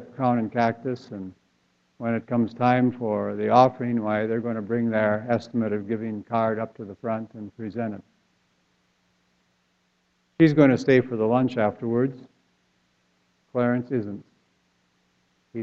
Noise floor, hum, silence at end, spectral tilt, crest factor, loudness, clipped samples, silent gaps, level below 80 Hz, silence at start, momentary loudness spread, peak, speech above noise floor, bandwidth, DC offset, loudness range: -69 dBFS; none; 0 s; -8.5 dB/octave; 22 dB; -24 LUFS; under 0.1%; none; -66 dBFS; 0 s; 16 LU; -4 dBFS; 46 dB; 7.4 kHz; under 0.1%; 9 LU